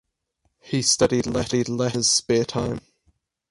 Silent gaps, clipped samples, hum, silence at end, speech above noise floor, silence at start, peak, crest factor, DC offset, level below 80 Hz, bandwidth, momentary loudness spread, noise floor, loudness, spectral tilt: none; under 0.1%; none; 0.7 s; 50 dB; 0.65 s; -6 dBFS; 18 dB; under 0.1%; -50 dBFS; 11.5 kHz; 10 LU; -72 dBFS; -22 LUFS; -3.5 dB/octave